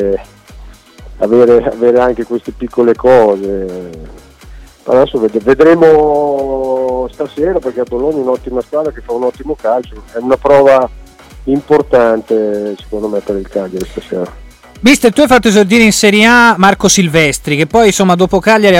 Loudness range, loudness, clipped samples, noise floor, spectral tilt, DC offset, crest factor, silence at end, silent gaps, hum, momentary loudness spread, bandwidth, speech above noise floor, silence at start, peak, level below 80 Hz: 7 LU; -10 LUFS; under 0.1%; -34 dBFS; -4.5 dB/octave; under 0.1%; 10 dB; 0 s; none; none; 13 LU; 16.5 kHz; 24 dB; 0 s; 0 dBFS; -34 dBFS